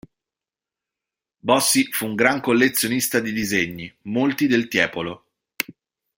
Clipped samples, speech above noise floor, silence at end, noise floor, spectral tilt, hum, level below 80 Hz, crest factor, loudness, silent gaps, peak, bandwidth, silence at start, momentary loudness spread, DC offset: under 0.1%; 69 dB; 0.45 s; -89 dBFS; -3 dB/octave; none; -60 dBFS; 22 dB; -20 LUFS; none; -2 dBFS; 16.5 kHz; 1.45 s; 12 LU; under 0.1%